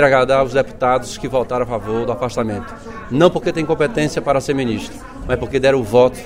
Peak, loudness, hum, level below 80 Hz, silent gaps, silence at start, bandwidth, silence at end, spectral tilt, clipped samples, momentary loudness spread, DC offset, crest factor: 0 dBFS; -18 LUFS; none; -38 dBFS; none; 0 s; 15.5 kHz; 0 s; -6 dB/octave; under 0.1%; 10 LU; under 0.1%; 16 dB